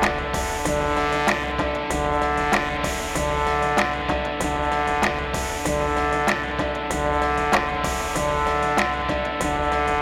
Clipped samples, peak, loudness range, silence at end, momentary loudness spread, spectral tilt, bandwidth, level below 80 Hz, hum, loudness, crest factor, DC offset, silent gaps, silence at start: under 0.1%; -10 dBFS; 1 LU; 0 s; 4 LU; -4 dB/octave; 17 kHz; -34 dBFS; none; -23 LUFS; 12 dB; under 0.1%; none; 0 s